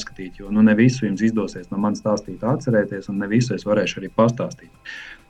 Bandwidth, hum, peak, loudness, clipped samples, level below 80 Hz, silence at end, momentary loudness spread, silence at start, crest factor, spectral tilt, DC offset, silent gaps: 8.8 kHz; none; -4 dBFS; -21 LUFS; under 0.1%; -48 dBFS; 0.15 s; 17 LU; 0 s; 16 dB; -6.5 dB/octave; under 0.1%; none